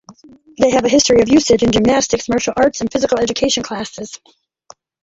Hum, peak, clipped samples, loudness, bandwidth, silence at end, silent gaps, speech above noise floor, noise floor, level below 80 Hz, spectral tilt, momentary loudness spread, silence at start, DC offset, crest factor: none; -2 dBFS; under 0.1%; -14 LUFS; 8 kHz; 0.85 s; none; 32 dB; -46 dBFS; -42 dBFS; -3.5 dB/octave; 13 LU; 0.1 s; under 0.1%; 14 dB